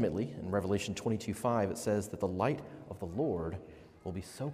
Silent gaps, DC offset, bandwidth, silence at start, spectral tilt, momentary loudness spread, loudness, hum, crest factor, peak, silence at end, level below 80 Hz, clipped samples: none; under 0.1%; 15.5 kHz; 0 s; -6 dB/octave; 11 LU; -35 LUFS; none; 18 dB; -16 dBFS; 0 s; -62 dBFS; under 0.1%